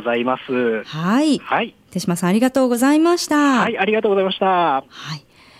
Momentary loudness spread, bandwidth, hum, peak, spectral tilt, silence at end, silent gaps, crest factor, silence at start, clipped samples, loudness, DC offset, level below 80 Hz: 10 LU; 16 kHz; none; -6 dBFS; -5 dB/octave; 0.4 s; none; 12 dB; 0 s; under 0.1%; -18 LUFS; under 0.1%; -60 dBFS